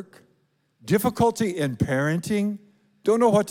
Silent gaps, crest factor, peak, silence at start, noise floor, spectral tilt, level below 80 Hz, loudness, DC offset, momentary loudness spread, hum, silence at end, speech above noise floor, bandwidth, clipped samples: none; 16 dB; -6 dBFS; 0 s; -67 dBFS; -6 dB/octave; -56 dBFS; -23 LUFS; under 0.1%; 9 LU; none; 0 s; 45 dB; 17.5 kHz; under 0.1%